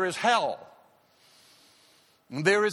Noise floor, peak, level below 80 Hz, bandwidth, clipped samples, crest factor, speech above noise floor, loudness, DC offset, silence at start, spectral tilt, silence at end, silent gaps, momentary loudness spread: -62 dBFS; -8 dBFS; -78 dBFS; 12.5 kHz; under 0.1%; 22 dB; 37 dB; -26 LUFS; under 0.1%; 0 s; -4 dB/octave; 0 s; none; 16 LU